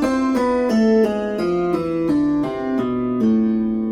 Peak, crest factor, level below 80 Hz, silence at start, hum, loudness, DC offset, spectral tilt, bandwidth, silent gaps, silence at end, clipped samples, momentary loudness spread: -6 dBFS; 12 dB; -46 dBFS; 0 s; none; -19 LUFS; under 0.1%; -7 dB/octave; 10.5 kHz; none; 0 s; under 0.1%; 5 LU